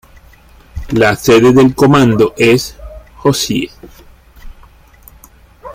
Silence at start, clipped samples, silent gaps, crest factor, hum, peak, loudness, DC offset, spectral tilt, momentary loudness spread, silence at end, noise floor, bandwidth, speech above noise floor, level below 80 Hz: 0.75 s; under 0.1%; none; 14 dB; none; 0 dBFS; -10 LUFS; under 0.1%; -5.5 dB/octave; 18 LU; 0 s; -42 dBFS; 16.5 kHz; 33 dB; -36 dBFS